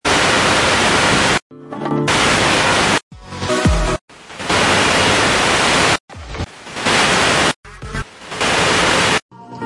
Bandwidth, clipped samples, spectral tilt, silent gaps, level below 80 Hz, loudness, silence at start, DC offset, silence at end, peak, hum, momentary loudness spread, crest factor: 11.5 kHz; under 0.1%; -3 dB/octave; 1.42-1.50 s, 3.03-3.11 s, 4.01-4.08 s, 6.00-6.08 s, 7.56-7.63 s, 9.22-9.29 s; -32 dBFS; -14 LUFS; 0.05 s; under 0.1%; 0 s; -2 dBFS; none; 15 LU; 14 dB